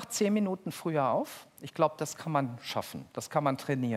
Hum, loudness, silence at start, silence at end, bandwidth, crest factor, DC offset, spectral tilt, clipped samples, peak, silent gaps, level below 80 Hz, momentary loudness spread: none; -32 LUFS; 0 s; 0 s; 16 kHz; 20 dB; under 0.1%; -5.5 dB/octave; under 0.1%; -12 dBFS; none; -76 dBFS; 12 LU